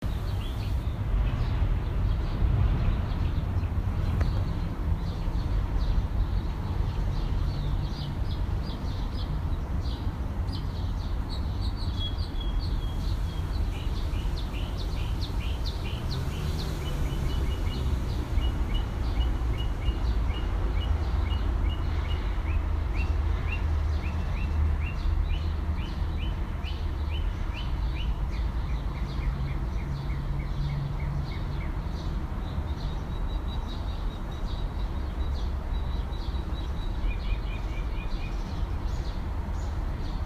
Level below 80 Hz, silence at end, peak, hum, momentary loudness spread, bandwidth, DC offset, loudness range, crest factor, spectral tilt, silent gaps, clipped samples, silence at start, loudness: -30 dBFS; 0 s; -14 dBFS; none; 5 LU; 13.5 kHz; under 0.1%; 4 LU; 14 dB; -7 dB/octave; none; under 0.1%; 0 s; -31 LUFS